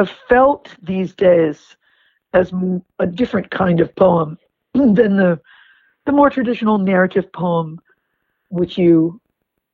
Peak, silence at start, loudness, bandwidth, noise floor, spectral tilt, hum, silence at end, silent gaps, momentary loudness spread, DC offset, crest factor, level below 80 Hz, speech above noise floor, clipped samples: 0 dBFS; 0 s; -16 LUFS; 6.2 kHz; -72 dBFS; -9 dB/octave; none; 0.55 s; none; 10 LU; under 0.1%; 16 dB; -50 dBFS; 57 dB; under 0.1%